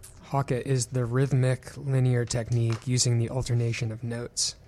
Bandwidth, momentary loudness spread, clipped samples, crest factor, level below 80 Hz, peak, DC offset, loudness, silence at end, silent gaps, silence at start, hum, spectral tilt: 12.5 kHz; 7 LU; under 0.1%; 14 dB; -50 dBFS; -12 dBFS; under 0.1%; -27 LUFS; 0.15 s; none; 0 s; none; -5 dB/octave